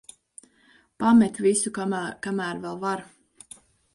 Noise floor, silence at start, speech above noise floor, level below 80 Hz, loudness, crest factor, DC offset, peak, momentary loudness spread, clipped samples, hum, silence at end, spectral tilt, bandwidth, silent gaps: -60 dBFS; 1 s; 37 dB; -64 dBFS; -24 LUFS; 18 dB; under 0.1%; -8 dBFS; 27 LU; under 0.1%; none; 0.9 s; -4.5 dB/octave; 11.5 kHz; none